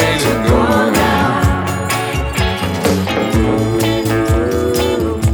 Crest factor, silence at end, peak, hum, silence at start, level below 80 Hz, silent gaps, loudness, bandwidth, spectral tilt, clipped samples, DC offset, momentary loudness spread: 14 dB; 0 s; 0 dBFS; none; 0 s; -26 dBFS; none; -15 LUFS; over 20 kHz; -5.5 dB/octave; under 0.1%; under 0.1%; 5 LU